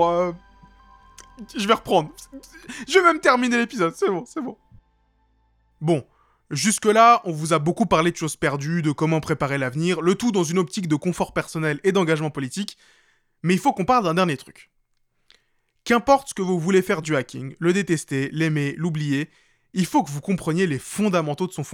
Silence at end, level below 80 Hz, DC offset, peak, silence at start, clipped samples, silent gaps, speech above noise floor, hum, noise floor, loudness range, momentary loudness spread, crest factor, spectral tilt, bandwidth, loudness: 0 s; -56 dBFS; under 0.1%; -2 dBFS; 0 s; under 0.1%; none; 46 dB; none; -68 dBFS; 4 LU; 13 LU; 20 dB; -5 dB/octave; 16.5 kHz; -22 LUFS